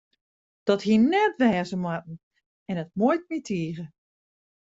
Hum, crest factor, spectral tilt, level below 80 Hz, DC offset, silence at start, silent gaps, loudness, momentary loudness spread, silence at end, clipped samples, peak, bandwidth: none; 18 dB; -6.5 dB/octave; -66 dBFS; under 0.1%; 0.65 s; 2.23-2.31 s, 2.46-2.66 s; -25 LUFS; 17 LU; 0.75 s; under 0.1%; -8 dBFS; 7.8 kHz